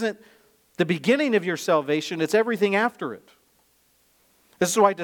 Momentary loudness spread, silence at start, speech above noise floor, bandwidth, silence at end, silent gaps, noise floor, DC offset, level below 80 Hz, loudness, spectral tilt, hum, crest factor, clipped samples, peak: 13 LU; 0 s; 41 dB; 18.5 kHz; 0 s; none; -64 dBFS; under 0.1%; -74 dBFS; -23 LUFS; -4.5 dB/octave; none; 20 dB; under 0.1%; -4 dBFS